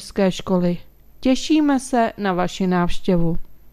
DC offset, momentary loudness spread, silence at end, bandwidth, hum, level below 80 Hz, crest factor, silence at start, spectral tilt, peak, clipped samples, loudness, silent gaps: under 0.1%; 7 LU; 0.05 s; 14 kHz; none; -38 dBFS; 14 dB; 0 s; -6 dB/octave; -6 dBFS; under 0.1%; -20 LUFS; none